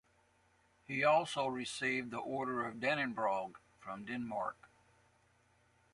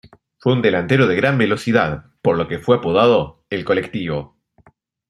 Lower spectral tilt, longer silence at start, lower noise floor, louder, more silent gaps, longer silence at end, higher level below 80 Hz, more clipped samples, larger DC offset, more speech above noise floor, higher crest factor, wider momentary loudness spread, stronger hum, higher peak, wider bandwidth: second, -4.5 dB/octave vs -7 dB/octave; first, 0.9 s vs 0.45 s; first, -72 dBFS vs -55 dBFS; second, -37 LUFS vs -18 LUFS; neither; first, 1.25 s vs 0.85 s; second, -76 dBFS vs -50 dBFS; neither; neither; about the same, 35 dB vs 38 dB; about the same, 20 dB vs 16 dB; first, 13 LU vs 10 LU; neither; second, -20 dBFS vs -2 dBFS; about the same, 11.5 kHz vs 12 kHz